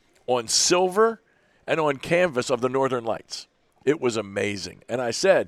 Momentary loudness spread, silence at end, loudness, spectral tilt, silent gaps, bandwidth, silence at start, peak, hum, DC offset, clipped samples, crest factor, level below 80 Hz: 13 LU; 0 s; -23 LUFS; -3 dB/octave; none; 15 kHz; 0.3 s; -6 dBFS; none; under 0.1%; under 0.1%; 18 dB; -62 dBFS